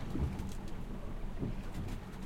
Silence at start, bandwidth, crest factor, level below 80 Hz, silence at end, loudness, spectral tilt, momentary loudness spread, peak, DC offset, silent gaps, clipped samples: 0 s; 15.5 kHz; 14 dB; -42 dBFS; 0 s; -43 LUFS; -7 dB/octave; 7 LU; -24 dBFS; under 0.1%; none; under 0.1%